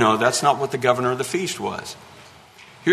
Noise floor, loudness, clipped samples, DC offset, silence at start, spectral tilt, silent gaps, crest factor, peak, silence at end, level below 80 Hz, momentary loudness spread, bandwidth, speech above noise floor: -47 dBFS; -21 LUFS; under 0.1%; under 0.1%; 0 s; -4 dB/octave; none; 20 dB; -2 dBFS; 0 s; -62 dBFS; 15 LU; 13.5 kHz; 25 dB